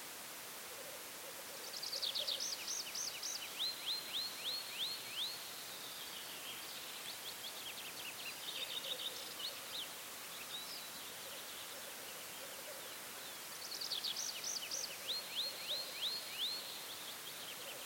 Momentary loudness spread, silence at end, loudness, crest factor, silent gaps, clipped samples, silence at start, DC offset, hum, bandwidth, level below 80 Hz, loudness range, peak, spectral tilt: 8 LU; 0 s; -42 LUFS; 18 dB; none; under 0.1%; 0 s; under 0.1%; none; 17 kHz; -84 dBFS; 5 LU; -28 dBFS; 0.5 dB/octave